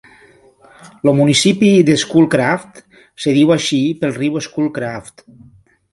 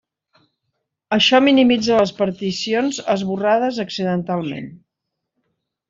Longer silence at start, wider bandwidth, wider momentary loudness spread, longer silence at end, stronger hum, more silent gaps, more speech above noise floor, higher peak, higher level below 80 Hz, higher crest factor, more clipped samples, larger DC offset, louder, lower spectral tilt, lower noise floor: second, 0.85 s vs 1.1 s; first, 11.5 kHz vs 7.6 kHz; about the same, 11 LU vs 11 LU; second, 0.85 s vs 1.15 s; neither; neither; second, 33 dB vs 62 dB; about the same, 0 dBFS vs -2 dBFS; first, -54 dBFS vs -60 dBFS; about the same, 16 dB vs 16 dB; neither; neither; first, -14 LUFS vs -18 LUFS; about the same, -5 dB/octave vs -5 dB/octave; second, -47 dBFS vs -80 dBFS